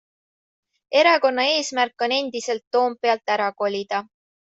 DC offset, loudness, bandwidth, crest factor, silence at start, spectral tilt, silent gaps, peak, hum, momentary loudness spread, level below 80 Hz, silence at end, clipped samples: under 0.1%; -21 LUFS; 8.2 kHz; 20 dB; 0.9 s; -2 dB/octave; 2.67-2.71 s; -4 dBFS; none; 10 LU; -74 dBFS; 0.45 s; under 0.1%